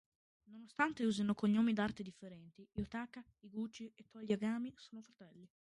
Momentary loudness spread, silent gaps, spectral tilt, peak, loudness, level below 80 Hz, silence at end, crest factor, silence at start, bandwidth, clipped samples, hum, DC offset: 22 LU; none; -6 dB/octave; -20 dBFS; -39 LUFS; -68 dBFS; 0.35 s; 20 dB; 0.5 s; 11 kHz; under 0.1%; none; under 0.1%